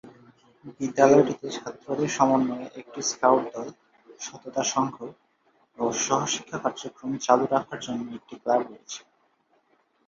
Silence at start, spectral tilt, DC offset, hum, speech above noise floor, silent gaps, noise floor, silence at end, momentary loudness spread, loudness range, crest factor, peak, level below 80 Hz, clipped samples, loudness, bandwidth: 0.05 s; -4 dB/octave; under 0.1%; none; 42 dB; none; -67 dBFS; 1.1 s; 17 LU; 5 LU; 24 dB; -4 dBFS; -70 dBFS; under 0.1%; -25 LUFS; 7.6 kHz